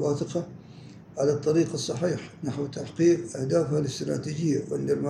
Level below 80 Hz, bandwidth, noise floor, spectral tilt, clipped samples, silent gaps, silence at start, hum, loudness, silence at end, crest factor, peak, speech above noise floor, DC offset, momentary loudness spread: -64 dBFS; 11.5 kHz; -46 dBFS; -6.5 dB/octave; under 0.1%; none; 0 s; none; -27 LUFS; 0 s; 16 dB; -10 dBFS; 20 dB; under 0.1%; 13 LU